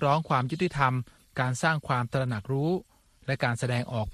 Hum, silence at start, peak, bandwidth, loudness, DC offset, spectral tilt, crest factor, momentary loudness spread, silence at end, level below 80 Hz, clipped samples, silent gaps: none; 0 s; -8 dBFS; 13 kHz; -28 LUFS; under 0.1%; -6 dB/octave; 20 dB; 8 LU; 0 s; -56 dBFS; under 0.1%; none